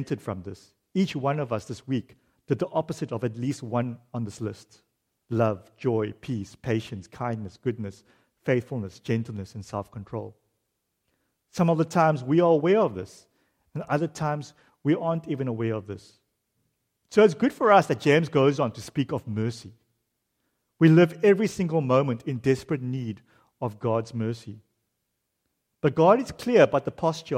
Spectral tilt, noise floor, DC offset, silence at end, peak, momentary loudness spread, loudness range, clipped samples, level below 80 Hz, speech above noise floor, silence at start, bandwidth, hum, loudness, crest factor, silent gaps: -7 dB/octave; -79 dBFS; under 0.1%; 0 s; -6 dBFS; 17 LU; 8 LU; under 0.1%; -64 dBFS; 54 dB; 0 s; 14 kHz; none; -25 LUFS; 20 dB; none